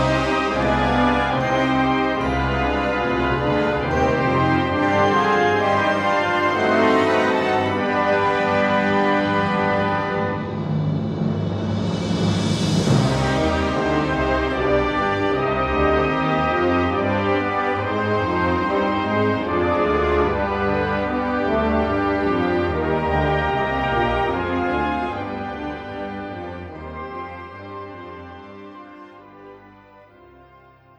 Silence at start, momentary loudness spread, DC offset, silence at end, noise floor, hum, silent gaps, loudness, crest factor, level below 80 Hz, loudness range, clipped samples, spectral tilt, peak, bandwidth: 0 s; 12 LU; under 0.1%; 1.3 s; -49 dBFS; none; none; -20 LUFS; 16 dB; -36 dBFS; 12 LU; under 0.1%; -6.5 dB/octave; -4 dBFS; 12.5 kHz